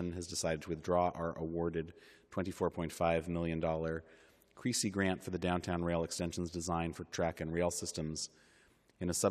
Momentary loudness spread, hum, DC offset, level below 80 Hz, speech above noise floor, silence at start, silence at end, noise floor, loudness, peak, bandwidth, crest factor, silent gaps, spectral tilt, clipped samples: 8 LU; none; under 0.1%; -62 dBFS; 31 dB; 0 s; 0 s; -68 dBFS; -37 LUFS; -16 dBFS; 14 kHz; 20 dB; none; -4.5 dB/octave; under 0.1%